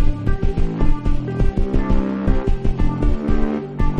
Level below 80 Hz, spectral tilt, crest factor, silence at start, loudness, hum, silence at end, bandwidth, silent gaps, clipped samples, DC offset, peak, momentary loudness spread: -18 dBFS; -9 dB/octave; 14 dB; 0 s; -22 LUFS; none; 0 s; 4.9 kHz; none; under 0.1%; under 0.1%; -2 dBFS; 2 LU